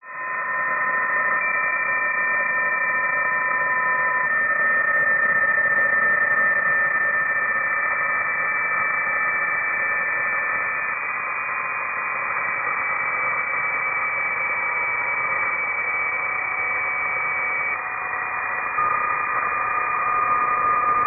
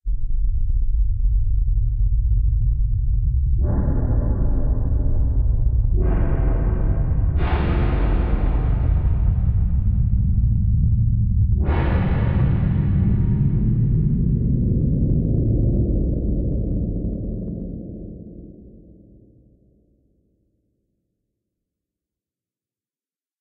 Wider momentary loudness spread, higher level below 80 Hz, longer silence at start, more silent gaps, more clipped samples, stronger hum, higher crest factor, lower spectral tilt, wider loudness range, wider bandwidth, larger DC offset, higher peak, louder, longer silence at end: about the same, 6 LU vs 6 LU; second, -60 dBFS vs -22 dBFS; about the same, 0.05 s vs 0.05 s; neither; neither; neither; about the same, 12 dB vs 12 dB; second, 5 dB/octave vs -13 dB/octave; about the same, 5 LU vs 7 LU; second, 2.9 kHz vs 3.9 kHz; neither; about the same, -10 dBFS vs -8 dBFS; about the same, -20 LUFS vs -21 LUFS; second, 0 s vs 4.65 s